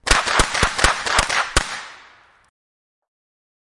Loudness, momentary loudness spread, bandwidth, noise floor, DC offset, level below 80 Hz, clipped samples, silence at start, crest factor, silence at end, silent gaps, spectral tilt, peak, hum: -18 LUFS; 13 LU; 11.5 kHz; -50 dBFS; under 0.1%; -30 dBFS; under 0.1%; 0.05 s; 22 dB; 1.65 s; none; -1.5 dB/octave; 0 dBFS; none